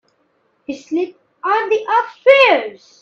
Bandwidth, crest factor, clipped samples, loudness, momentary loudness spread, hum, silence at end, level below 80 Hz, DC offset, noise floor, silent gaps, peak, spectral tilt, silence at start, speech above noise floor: 7.2 kHz; 16 dB; under 0.1%; -15 LUFS; 20 LU; none; 0.3 s; -66 dBFS; under 0.1%; -62 dBFS; none; 0 dBFS; -3 dB/octave; 0.7 s; 47 dB